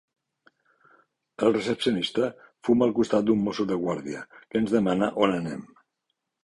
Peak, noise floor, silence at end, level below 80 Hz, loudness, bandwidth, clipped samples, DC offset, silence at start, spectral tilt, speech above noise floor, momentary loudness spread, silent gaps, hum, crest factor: -6 dBFS; -80 dBFS; 0.8 s; -62 dBFS; -25 LUFS; 11.5 kHz; under 0.1%; under 0.1%; 1.4 s; -6 dB/octave; 56 dB; 10 LU; none; none; 20 dB